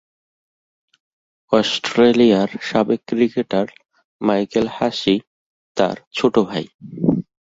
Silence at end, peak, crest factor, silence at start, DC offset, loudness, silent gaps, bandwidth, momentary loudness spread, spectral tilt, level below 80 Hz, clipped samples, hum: 0.35 s; -2 dBFS; 18 dB; 1.5 s; under 0.1%; -19 LUFS; 4.04-4.19 s, 5.27-5.75 s, 6.07-6.11 s, 6.74-6.79 s; 7.8 kHz; 9 LU; -6 dB/octave; -56 dBFS; under 0.1%; none